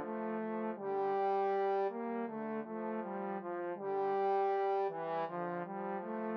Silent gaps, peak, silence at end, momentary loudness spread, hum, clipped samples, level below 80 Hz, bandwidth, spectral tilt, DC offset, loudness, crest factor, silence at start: none; -24 dBFS; 0 s; 7 LU; none; under 0.1%; under -90 dBFS; 5.8 kHz; -5.5 dB/octave; under 0.1%; -37 LUFS; 12 dB; 0 s